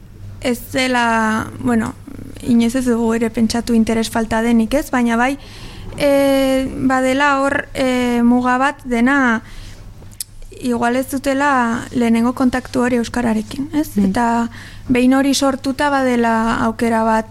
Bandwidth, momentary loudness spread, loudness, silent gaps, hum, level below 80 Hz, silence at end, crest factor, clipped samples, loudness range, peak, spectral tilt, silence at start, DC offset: 16 kHz; 10 LU; -16 LUFS; none; none; -38 dBFS; 0 s; 16 dB; under 0.1%; 3 LU; -2 dBFS; -5 dB/octave; 0 s; under 0.1%